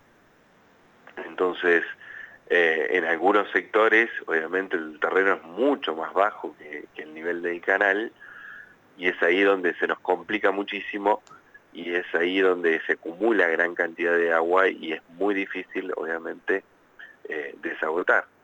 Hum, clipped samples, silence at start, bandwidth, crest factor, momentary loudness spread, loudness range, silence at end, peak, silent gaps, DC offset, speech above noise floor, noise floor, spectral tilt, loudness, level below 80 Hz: none; under 0.1%; 1.15 s; 19 kHz; 20 dB; 16 LU; 5 LU; 0.2 s; -6 dBFS; none; under 0.1%; 34 dB; -58 dBFS; -5 dB/octave; -24 LUFS; -76 dBFS